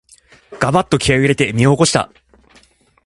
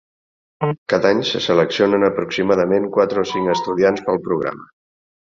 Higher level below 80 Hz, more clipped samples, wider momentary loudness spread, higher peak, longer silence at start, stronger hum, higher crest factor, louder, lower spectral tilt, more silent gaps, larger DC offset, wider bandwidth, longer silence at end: first, -40 dBFS vs -56 dBFS; neither; about the same, 7 LU vs 8 LU; about the same, 0 dBFS vs -2 dBFS; about the same, 0.5 s vs 0.6 s; neither; about the same, 16 dB vs 16 dB; first, -14 LUFS vs -18 LUFS; about the same, -5 dB/octave vs -5.5 dB/octave; second, none vs 0.78-0.86 s; neither; first, 11.5 kHz vs 7.4 kHz; first, 1 s vs 0.65 s